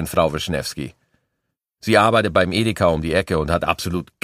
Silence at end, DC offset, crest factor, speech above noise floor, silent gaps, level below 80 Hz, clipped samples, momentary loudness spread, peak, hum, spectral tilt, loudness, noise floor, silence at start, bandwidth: 0.2 s; under 0.1%; 20 dB; 58 dB; none; -40 dBFS; under 0.1%; 12 LU; 0 dBFS; none; -5 dB/octave; -19 LUFS; -78 dBFS; 0 s; 15.5 kHz